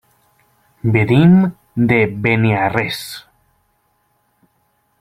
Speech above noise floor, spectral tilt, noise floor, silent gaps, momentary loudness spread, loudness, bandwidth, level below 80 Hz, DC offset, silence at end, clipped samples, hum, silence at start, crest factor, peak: 49 dB; -7.5 dB/octave; -63 dBFS; none; 14 LU; -15 LUFS; 15 kHz; -48 dBFS; under 0.1%; 1.8 s; under 0.1%; none; 0.85 s; 16 dB; 0 dBFS